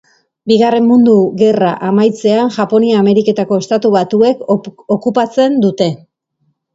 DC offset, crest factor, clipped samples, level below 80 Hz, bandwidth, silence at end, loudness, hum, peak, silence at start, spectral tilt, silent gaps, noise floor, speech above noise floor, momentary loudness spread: under 0.1%; 12 dB; under 0.1%; -58 dBFS; 8 kHz; 0.8 s; -12 LUFS; none; 0 dBFS; 0.45 s; -7 dB/octave; none; -63 dBFS; 52 dB; 8 LU